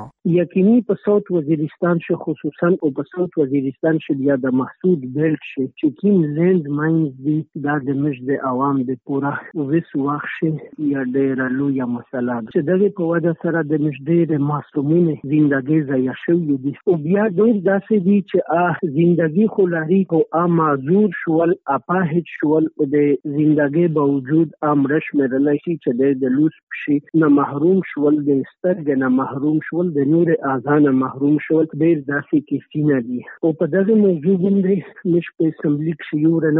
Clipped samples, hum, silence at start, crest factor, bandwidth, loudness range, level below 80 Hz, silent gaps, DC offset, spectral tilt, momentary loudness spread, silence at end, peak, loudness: under 0.1%; none; 0 s; 12 dB; 3.9 kHz; 3 LU; -66 dBFS; 26.63-26.67 s; under 0.1%; -8.5 dB/octave; 6 LU; 0 s; -6 dBFS; -18 LUFS